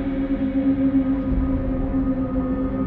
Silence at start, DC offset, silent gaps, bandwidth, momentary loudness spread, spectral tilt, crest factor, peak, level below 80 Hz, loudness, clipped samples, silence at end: 0 s; under 0.1%; none; 4.1 kHz; 4 LU; -11.5 dB/octave; 12 dB; -10 dBFS; -30 dBFS; -22 LUFS; under 0.1%; 0 s